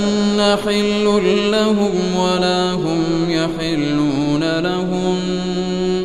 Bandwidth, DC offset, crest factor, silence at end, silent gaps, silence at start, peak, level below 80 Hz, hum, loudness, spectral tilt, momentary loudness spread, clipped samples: 13.5 kHz; under 0.1%; 14 dB; 0 s; none; 0 s; -4 dBFS; -44 dBFS; none; -17 LUFS; -5.5 dB/octave; 4 LU; under 0.1%